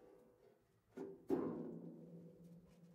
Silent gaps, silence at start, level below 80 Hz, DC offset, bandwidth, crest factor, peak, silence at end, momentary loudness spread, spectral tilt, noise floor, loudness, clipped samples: none; 0 s; -82 dBFS; under 0.1%; 15.5 kHz; 24 dB; -26 dBFS; 0 s; 21 LU; -9 dB/octave; -73 dBFS; -48 LUFS; under 0.1%